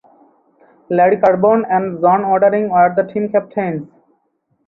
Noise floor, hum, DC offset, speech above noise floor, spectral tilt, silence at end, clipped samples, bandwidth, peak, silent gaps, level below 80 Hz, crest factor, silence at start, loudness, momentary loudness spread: -65 dBFS; none; under 0.1%; 51 dB; -10 dB/octave; 0.8 s; under 0.1%; 4.1 kHz; 0 dBFS; none; -60 dBFS; 14 dB; 0.9 s; -15 LUFS; 9 LU